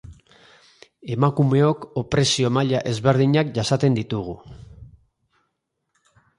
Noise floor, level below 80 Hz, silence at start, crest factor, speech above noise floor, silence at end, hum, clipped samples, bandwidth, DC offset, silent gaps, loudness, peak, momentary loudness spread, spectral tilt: -76 dBFS; -52 dBFS; 0.05 s; 18 dB; 56 dB; 1.5 s; none; under 0.1%; 11.5 kHz; under 0.1%; none; -21 LUFS; -4 dBFS; 12 LU; -6 dB/octave